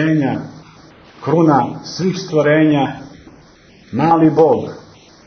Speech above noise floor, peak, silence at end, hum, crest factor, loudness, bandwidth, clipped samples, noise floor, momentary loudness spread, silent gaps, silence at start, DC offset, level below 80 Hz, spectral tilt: 31 dB; 0 dBFS; 0.45 s; none; 16 dB; -15 LUFS; 6.6 kHz; under 0.1%; -45 dBFS; 15 LU; none; 0 s; under 0.1%; -54 dBFS; -7 dB/octave